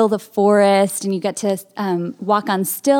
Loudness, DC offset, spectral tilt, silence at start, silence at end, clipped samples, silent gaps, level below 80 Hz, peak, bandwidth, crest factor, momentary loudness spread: -18 LUFS; under 0.1%; -5 dB/octave; 0 s; 0 s; under 0.1%; none; -72 dBFS; -2 dBFS; 18 kHz; 16 dB; 9 LU